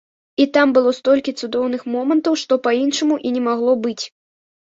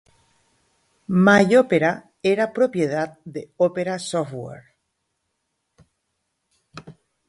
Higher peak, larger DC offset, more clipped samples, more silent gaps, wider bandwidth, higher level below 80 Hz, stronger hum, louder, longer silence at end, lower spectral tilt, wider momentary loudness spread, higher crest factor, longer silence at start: about the same, -2 dBFS vs -2 dBFS; neither; neither; neither; second, 7.8 kHz vs 11.5 kHz; about the same, -64 dBFS vs -64 dBFS; neither; about the same, -18 LUFS vs -20 LUFS; first, 0.6 s vs 0.4 s; second, -3.5 dB/octave vs -6 dB/octave; second, 8 LU vs 20 LU; about the same, 16 dB vs 20 dB; second, 0.4 s vs 1.1 s